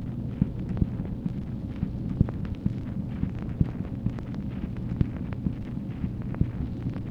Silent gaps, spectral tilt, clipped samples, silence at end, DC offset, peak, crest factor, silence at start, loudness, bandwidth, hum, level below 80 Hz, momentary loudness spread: none; -10.5 dB/octave; under 0.1%; 0 s; under 0.1%; -8 dBFS; 22 dB; 0 s; -31 LUFS; 5.8 kHz; none; -38 dBFS; 5 LU